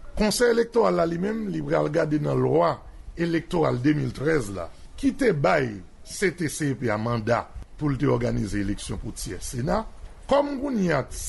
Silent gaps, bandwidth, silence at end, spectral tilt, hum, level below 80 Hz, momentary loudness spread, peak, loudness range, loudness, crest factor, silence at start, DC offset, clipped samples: none; 12 kHz; 0 s; -6 dB/octave; none; -40 dBFS; 12 LU; -10 dBFS; 3 LU; -25 LUFS; 16 dB; 0 s; under 0.1%; under 0.1%